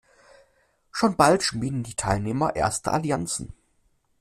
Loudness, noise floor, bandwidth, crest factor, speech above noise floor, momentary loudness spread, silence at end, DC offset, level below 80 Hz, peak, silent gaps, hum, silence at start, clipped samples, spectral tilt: -24 LUFS; -67 dBFS; 15 kHz; 22 dB; 43 dB; 11 LU; 0.65 s; under 0.1%; -48 dBFS; -4 dBFS; none; none; 0.95 s; under 0.1%; -4.5 dB/octave